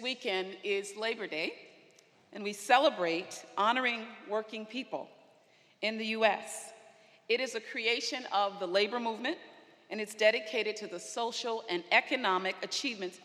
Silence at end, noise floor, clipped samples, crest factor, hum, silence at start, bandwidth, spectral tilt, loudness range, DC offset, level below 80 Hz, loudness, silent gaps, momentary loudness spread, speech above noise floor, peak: 0.05 s; -65 dBFS; under 0.1%; 26 dB; none; 0 s; 15 kHz; -2.5 dB/octave; 3 LU; under 0.1%; under -90 dBFS; -32 LUFS; none; 13 LU; 32 dB; -8 dBFS